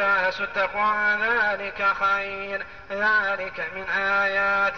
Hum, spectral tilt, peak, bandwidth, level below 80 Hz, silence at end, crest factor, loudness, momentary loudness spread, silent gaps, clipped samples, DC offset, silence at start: none; -4 dB/octave; -12 dBFS; 6.6 kHz; -56 dBFS; 0 s; 12 dB; -23 LUFS; 9 LU; none; under 0.1%; 0.4%; 0 s